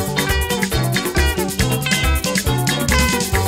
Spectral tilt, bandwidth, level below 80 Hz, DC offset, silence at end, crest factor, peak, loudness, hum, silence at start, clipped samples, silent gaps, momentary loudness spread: -4 dB/octave; 16.5 kHz; -24 dBFS; under 0.1%; 0 s; 16 dB; -2 dBFS; -18 LUFS; none; 0 s; under 0.1%; none; 3 LU